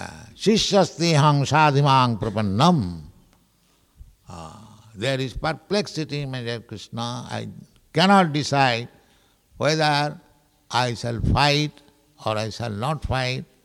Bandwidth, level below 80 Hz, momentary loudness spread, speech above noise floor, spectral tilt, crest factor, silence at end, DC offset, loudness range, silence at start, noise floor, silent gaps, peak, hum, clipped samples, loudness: 13 kHz; -42 dBFS; 16 LU; 41 dB; -5 dB/octave; 18 dB; 0.2 s; under 0.1%; 9 LU; 0 s; -62 dBFS; none; -4 dBFS; none; under 0.1%; -22 LUFS